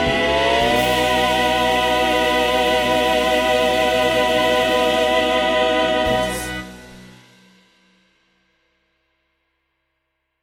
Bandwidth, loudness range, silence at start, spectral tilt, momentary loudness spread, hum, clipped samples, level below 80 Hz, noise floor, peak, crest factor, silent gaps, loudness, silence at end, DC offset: 16.5 kHz; 8 LU; 0 s; -3.5 dB/octave; 2 LU; none; under 0.1%; -40 dBFS; -74 dBFS; -6 dBFS; 14 dB; none; -17 LUFS; 3.35 s; under 0.1%